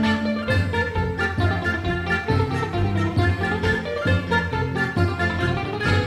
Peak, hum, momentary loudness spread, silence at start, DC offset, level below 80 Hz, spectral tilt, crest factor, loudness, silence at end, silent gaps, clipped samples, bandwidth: -6 dBFS; none; 2 LU; 0 s; under 0.1%; -38 dBFS; -7 dB/octave; 16 dB; -22 LUFS; 0 s; none; under 0.1%; 11.5 kHz